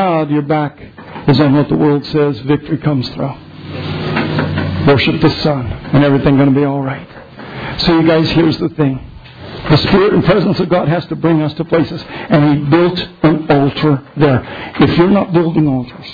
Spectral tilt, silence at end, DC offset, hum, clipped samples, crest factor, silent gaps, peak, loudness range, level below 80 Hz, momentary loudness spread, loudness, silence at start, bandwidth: -8.5 dB/octave; 0 s; under 0.1%; none; under 0.1%; 12 dB; none; 0 dBFS; 3 LU; -36 dBFS; 13 LU; -13 LUFS; 0 s; 5 kHz